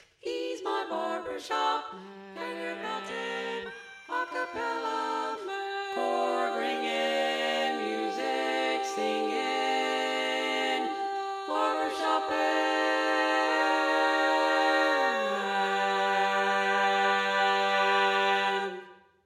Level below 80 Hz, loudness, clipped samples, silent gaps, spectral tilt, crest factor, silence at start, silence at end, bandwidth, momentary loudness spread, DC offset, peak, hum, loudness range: -78 dBFS; -28 LUFS; under 0.1%; none; -2.5 dB/octave; 16 dB; 0.25 s; 0.3 s; 15 kHz; 10 LU; under 0.1%; -14 dBFS; none; 8 LU